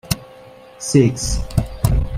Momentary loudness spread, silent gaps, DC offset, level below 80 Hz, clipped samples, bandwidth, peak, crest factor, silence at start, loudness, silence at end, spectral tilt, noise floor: 10 LU; none; under 0.1%; -26 dBFS; under 0.1%; 16 kHz; 0 dBFS; 18 dB; 0.05 s; -19 LUFS; 0 s; -5.5 dB/octave; -42 dBFS